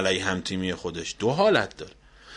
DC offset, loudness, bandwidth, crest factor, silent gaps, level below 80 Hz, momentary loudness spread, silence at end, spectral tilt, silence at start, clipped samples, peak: under 0.1%; -25 LUFS; 10.5 kHz; 20 dB; none; -54 dBFS; 15 LU; 0 s; -4 dB/octave; 0 s; under 0.1%; -6 dBFS